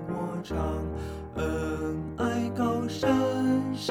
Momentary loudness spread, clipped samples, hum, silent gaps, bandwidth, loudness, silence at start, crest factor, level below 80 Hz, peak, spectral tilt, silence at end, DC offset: 8 LU; under 0.1%; none; none; 15.5 kHz; -29 LUFS; 0 s; 18 dB; -42 dBFS; -12 dBFS; -6.5 dB/octave; 0 s; under 0.1%